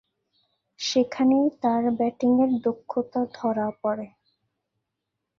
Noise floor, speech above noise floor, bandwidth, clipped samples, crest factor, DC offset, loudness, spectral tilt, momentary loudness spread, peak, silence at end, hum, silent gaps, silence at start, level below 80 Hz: -82 dBFS; 59 dB; 7.4 kHz; under 0.1%; 16 dB; under 0.1%; -24 LUFS; -5 dB/octave; 9 LU; -10 dBFS; 1.3 s; none; none; 0.8 s; -70 dBFS